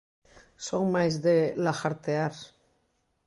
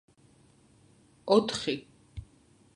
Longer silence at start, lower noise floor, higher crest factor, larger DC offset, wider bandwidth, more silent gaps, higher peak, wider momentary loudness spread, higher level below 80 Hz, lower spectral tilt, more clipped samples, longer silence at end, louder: second, 0.6 s vs 1.25 s; first, -73 dBFS vs -62 dBFS; second, 18 dB vs 24 dB; neither; about the same, 11.5 kHz vs 11 kHz; neither; second, -12 dBFS vs -8 dBFS; second, 9 LU vs 23 LU; second, -68 dBFS vs -58 dBFS; first, -6 dB/octave vs -4.5 dB/octave; neither; first, 0.8 s vs 0.5 s; about the same, -27 LUFS vs -28 LUFS